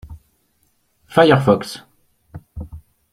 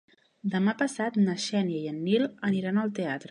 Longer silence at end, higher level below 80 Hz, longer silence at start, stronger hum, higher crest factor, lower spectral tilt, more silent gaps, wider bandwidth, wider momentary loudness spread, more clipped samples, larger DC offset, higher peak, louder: first, 0.35 s vs 0.05 s; first, -46 dBFS vs -74 dBFS; second, 0.05 s vs 0.45 s; neither; about the same, 20 dB vs 18 dB; about the same, -6.5 dB/octave vs -6 dB/octave; neither; first, 15 kHz vs 11 kHz; first, 24 LU vs 6 LU; neither; neither; first, -2 dBFS vs -10 dBFS; first, -15 LUFS vs -28 LUFS